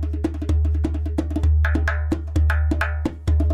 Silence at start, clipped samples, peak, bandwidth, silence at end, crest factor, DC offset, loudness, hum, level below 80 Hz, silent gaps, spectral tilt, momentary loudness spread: 0 s; under 0.1%; -8 dBFS; 7.2 kHz; 0 s; 12 dB; under 0.1%; -22 LUFS; none; -22 dBFS; none; -8 dB/octave; 5 LU